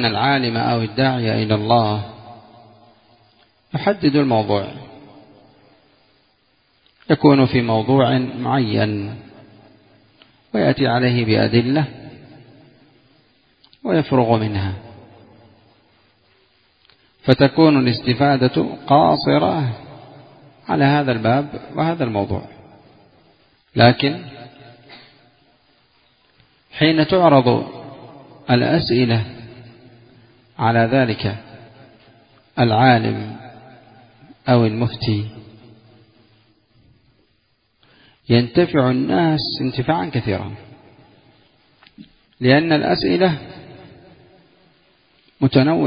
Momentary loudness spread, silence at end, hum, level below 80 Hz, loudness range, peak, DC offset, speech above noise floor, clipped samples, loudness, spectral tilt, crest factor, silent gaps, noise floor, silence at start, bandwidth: 19 LU; 0 s; none; -48 dBFS; 6 LU; 0 dBFS; under 0.1%; 48 dB; under 0.1%; -17 LUFS; -10 dB/octave; 20 dB; none; -64 dBFS; 0 s; 5.2 kHz